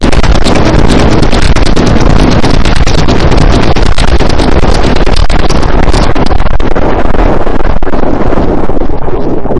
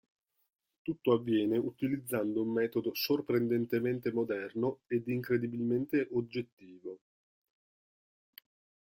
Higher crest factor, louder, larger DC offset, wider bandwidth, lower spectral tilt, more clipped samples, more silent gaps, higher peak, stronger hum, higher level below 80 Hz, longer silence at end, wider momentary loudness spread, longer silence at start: second, 4 dB vs 20 dB; first, -9 LUFS vs -33 LUFS; first, 8% vs under 0.1%; second, 10.5 kHz vs 16.5 kHz; about the same, -6 dB/octave vs -6.5 dB/octave; first, 3% vs under 0.1%; second, none vs 6.52-6.57 s; first, 0 dBFS vs -14 dBFS; neither; first, -8 dBFS vs -72 dBFS; second, 0 s vs 2 s; second, 6 LU vs 12 LU; second, 0 s vs 0.85 s